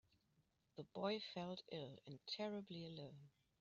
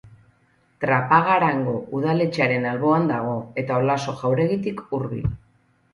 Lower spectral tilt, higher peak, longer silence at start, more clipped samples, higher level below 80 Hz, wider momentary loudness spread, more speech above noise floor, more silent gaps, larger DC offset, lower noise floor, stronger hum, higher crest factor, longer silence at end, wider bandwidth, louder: second, -4 dB/octave vs -7.5 dB/octave; second, -30 dBFS vs -4 dBFS; first, 0.75 s vs 0.05 s; neither; second, -86 dBFS vs -48 dBFS; first, 14 LU vs 10 LU; second, 32 dB vs 40 dB; neither; neither; first, -82 dBFS vs -62 dBFS; neither; about the same, 20 dB vs 18 dB; second, 0.3 s vs 0.55 s; second, 7.4 kHz vs 11.5 kHz; second, -50 LUFS vs -22 LUFS